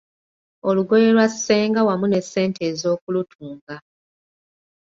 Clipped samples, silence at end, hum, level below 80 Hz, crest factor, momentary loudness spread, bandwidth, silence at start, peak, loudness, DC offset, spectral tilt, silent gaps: under 0.1%; 1.1 s; none; -64 dBFS; 16 dB; 20 LU; 7.8 kHz; 0.65 s; -4 dBFS; -19 LUFS; under 0.1%; -5 dB/octave; 3.01-3.07 s, 3.35-3.39 s, 3.61-3.67 s